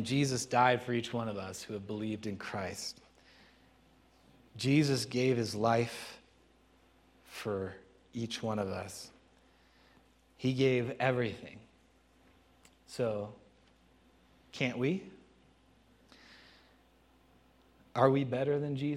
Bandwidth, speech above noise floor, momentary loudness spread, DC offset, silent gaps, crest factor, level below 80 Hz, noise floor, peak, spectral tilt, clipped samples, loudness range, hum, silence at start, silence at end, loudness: 15 kHz; 33 dB; 19 LU; under 0.1%; none; 24 dB; -70 dBFS; -66 dBFS; -12 dBFS; -5.5 dB/octave; under 0.1%; 8 LU; none; 0 s; 0 s; -33 LUFS